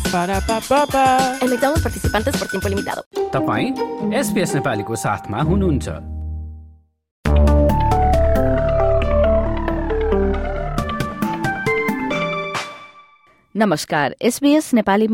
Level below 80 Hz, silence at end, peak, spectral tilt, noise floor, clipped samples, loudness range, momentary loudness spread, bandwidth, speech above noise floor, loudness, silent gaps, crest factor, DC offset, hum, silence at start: -26 dBFS; 0 s; -4 dBFS; -5.5 dB/octave; -53 dBFS; under 0.1%; 4 LU; 9 LU; 16.5 kHz; 35 dB; -19 LUFS; 3.06-3.11 s, 7.11-7.23 s; 14 dB; under 0.1%; none; 0 s